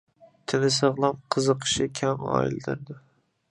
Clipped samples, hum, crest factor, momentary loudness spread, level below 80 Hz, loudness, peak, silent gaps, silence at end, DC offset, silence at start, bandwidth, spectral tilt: under 0.1%; none; 20 dB; 14 LU; -58 dBFS; -25 LUFS; -6 dBFS; none; 0.55 s; under 0.1%; 0.5 s; 11.5 kHz; -4.5 dB/octave